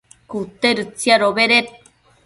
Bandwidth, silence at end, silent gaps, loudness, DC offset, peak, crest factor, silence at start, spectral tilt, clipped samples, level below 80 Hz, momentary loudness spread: 11.5 kHz; 0.55 s; none; -16 LUFS; under 0.1%; 0 dBFS; 18 dB; 0.3 s; -3 dB/octave; under 0.1%; -60 dBFS; 16 LU